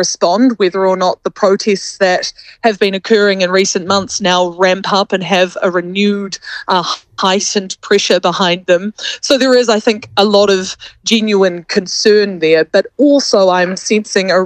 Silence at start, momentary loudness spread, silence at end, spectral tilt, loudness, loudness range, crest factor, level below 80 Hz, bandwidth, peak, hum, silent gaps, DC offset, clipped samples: 0 s; 6 LU; 0 s; -3.5 dB/octave; -12 LUFS; 2 LU; 12 dB; -56 dBFS; 11 kHz; 0 dBFS; none; none; under 0.1%; under 0.1%